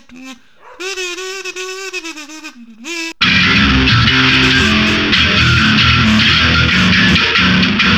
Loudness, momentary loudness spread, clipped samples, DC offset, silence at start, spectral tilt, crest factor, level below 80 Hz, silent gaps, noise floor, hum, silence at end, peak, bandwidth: -10 LUFS; 15 LU; under 0.1%; 0.6%; 0.1 s; -4 dB/octave; 12 dB; -28 dBFS; none; -33 dBFS; none; 0 s; 0 dBFS; 14 kHz